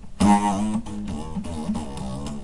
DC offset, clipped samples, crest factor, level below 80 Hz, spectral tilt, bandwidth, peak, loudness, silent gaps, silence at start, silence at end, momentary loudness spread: 1%; under 0.1%; 18 dB; -40 dBFS; -6 dB/octave; 11.5 kHz; -6 dBFS; -25 LUFS; none; 0 s; 0 s; 13 LU